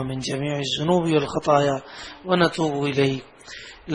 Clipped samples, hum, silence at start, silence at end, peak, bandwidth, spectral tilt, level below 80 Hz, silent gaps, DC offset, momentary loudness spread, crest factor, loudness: under 0.1%; none; 0 s; 0 s; -4 dBFS; 11 kHz; -5.5 dB/octave; -54 dBFS; none; under 0.1%; 18 LU; 20 dB; -22 LUFS